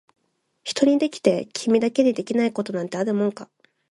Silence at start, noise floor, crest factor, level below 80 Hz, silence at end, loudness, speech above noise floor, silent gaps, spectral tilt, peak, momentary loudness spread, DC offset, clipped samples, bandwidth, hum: 0.65 s; -62 dBFS; 20 dB; -70 dBFS; 0.45 s; -22 LUFS; 41 dB; none; -5 dB/octave; -4 dBFS; 8 LU; under 0.1%; under 0.1%; 11.5 kHz; none